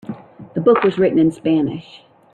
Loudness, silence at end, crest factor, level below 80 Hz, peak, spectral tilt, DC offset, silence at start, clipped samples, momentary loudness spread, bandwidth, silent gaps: -16 LUFS; 0.55 s; 16 dB; -56 dBFS; -2 dBFS; -8.5 dB/octave; under 0.1%; 0.1 s; under 0.1%; 19 LU; 9.2 kHz; none